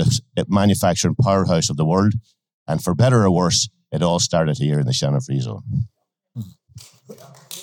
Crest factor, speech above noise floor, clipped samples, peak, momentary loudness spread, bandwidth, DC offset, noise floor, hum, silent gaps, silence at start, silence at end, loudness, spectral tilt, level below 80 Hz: 14 dB; 27 dB; under 0.1%; -6 dBFS; 15 LU; 17.5 kHz; under 0.1%; -45 dBFS; none; 2.54-2.66 s; 0 s; 0 s; -19 LUFS; -5.5 dB/octave; -50 dBFS